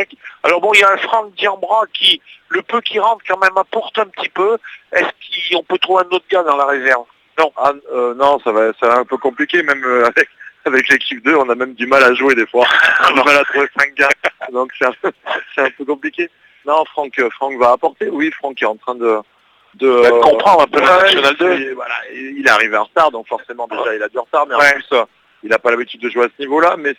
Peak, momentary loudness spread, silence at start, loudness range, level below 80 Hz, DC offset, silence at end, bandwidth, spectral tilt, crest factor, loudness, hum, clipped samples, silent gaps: 0 dBFS; 11 LU; 0 s; 6 LU; -58 dBFS; under 0.1%; 0.05 s; 19 kHz; -2.5 dB/octave; 14 dB; -14 LUFS; none; 0.1%; none